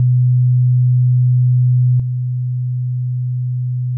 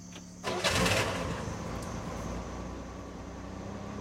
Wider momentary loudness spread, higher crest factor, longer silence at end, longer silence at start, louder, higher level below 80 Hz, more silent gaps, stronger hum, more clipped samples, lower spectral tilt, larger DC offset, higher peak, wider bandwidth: second, 7 LU vs 16 LU; second, 6 dB vs 22 dB; about the same, 0 s vs 0 s; about the same, 0 s vs 0 s; first, -15 LUFS vs -34 LUFS; second, -54 dBFS vs -46 dBFS; neither; neither; neither; first, -17.5 dB/octave vs -4 dB/octave; neither; first, -8 dBFS vs -12 dBFS; second, 0.3 kHz vs 16.5 kHz